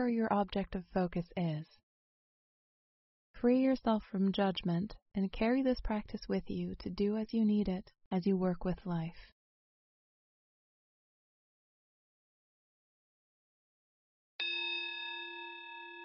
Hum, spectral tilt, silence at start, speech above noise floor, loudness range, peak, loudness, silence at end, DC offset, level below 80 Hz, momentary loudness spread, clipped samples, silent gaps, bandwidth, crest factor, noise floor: none; -5 dB/octave; 0 s; over 56 dB; 9 LU; -18 dBFS; -35 LUFS; 0 s; under 0.1%; -56 dBFS; 11 LU; under 0.1%; 1.83-3.34 s, 5.02-5.06 s, 8.06-8.11 s, 9.32-14.39 s; 5.8 kHz; 20 dB; under -90 dBFS